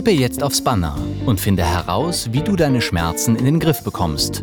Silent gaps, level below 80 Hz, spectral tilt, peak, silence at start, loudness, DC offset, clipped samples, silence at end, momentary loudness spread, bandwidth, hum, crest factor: none; -34 dBFS; -5 dB/octave; -6 dBFS; 0 s; -18 LUFS; under 0.1%; under 0.1%; 0 s; 4 LU; over 20 kHz; none; 12 dB